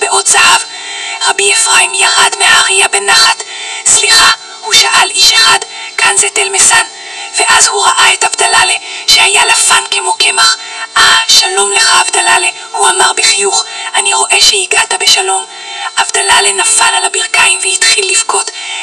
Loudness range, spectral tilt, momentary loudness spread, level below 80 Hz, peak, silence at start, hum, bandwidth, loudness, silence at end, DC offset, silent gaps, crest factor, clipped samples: 2 LU; 2 dB/octave; 9 LU; -46 dBFS; 0 dBFS; 0 s; none; 12 kHz; -6 LUFS; 0 s; under 0.1%; none; 8 dB; 3%